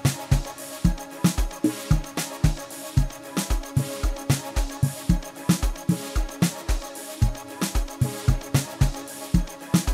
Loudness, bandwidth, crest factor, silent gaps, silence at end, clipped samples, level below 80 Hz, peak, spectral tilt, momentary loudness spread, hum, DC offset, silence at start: -26 LUFS; 16 kHz; 18 dB; none; 0 s; under 0.1%; -30 dBFS; -6 dBFS; -5.5 dB/octave; 6 LU; none; under 0.1%; 0 s